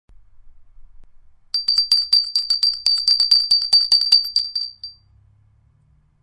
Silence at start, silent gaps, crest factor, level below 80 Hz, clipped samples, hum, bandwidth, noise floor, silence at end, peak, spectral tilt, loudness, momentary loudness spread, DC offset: 0.45 s; none; 18 dB; -54 dBFS; under 0.1%; none; 12 kHz; -57 dBFS; 1.3 s; -2 dBFS; 2.5 dB/octave; -15 LUFS; 12 LU; under 0.1%